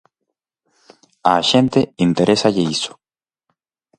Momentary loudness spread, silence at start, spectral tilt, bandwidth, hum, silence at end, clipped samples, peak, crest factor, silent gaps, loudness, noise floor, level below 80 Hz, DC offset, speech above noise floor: 7 LU; 1.25 s; -5 dB/octave; 11 kHz; none; 1.1 s; under 0.1%; 0 dBFS; 18 dB; none; -16 LUFS; under -90 dBFS; -54 dBFS; under 0.1%; over 74 dB